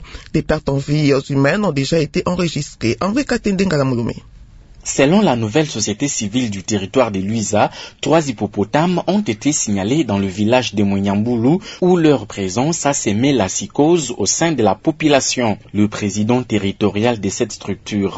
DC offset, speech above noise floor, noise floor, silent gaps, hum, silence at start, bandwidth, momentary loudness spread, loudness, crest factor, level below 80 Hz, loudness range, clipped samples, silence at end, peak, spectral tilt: under 0.1%; 24 dB; -40 dBFS; none; none; 0 s; 8 kHz; 6 LU; -17 LUFS; 16 dB; -42 dBFS; 2 LU; under 0.1%; 0 s; 0 dBFS; -5 dB/octave